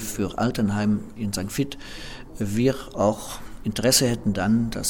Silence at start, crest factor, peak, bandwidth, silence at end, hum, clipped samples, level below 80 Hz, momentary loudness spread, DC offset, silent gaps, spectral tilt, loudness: 0 s; 20 dB; -4 dBFS; 19.5 kHz; 0 s; none; under 0.1%; -42 dBFS; 16 LU; under 0.1%; none; -4.5 dB/octave; -24 LUFS